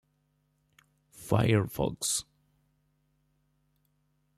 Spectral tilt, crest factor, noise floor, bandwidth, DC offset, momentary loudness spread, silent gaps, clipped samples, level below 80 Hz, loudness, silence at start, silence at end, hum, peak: -4.5 dB/octave; 24 dB; -74 dBFS; 15 kHz; under 0.1%; 7 LU; none; under 0.1%; -56 dBFS; -29 LUFS; 1.2 s; 2.15 s; 50 Hz at -50 dBFS; -10 dBFS